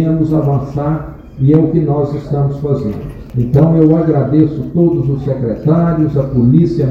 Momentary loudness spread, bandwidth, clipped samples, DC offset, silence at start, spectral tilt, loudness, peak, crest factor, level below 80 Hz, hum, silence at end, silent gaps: 8 LU; 5.4 kHz; 0.2%; under 0.1%; 0 s; -11.5 dB/octave; -13 LUFS; 0 dBFS; 12 dB; -34 dBFS; none; 0 s; none